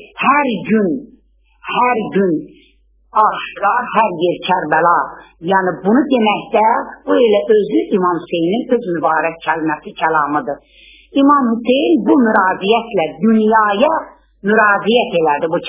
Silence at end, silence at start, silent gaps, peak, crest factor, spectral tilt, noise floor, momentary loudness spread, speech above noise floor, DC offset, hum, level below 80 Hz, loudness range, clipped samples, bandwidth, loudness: 0 s; 0 s; none; 0 dBFS; 14 dB; -9.5 dB/octave; -53 dBFS; 8 LU; 39 dB; under 0.1%; none; -54 dBFS; 4 LU; under 0.1%; 3.9 kHz; -14 LUFS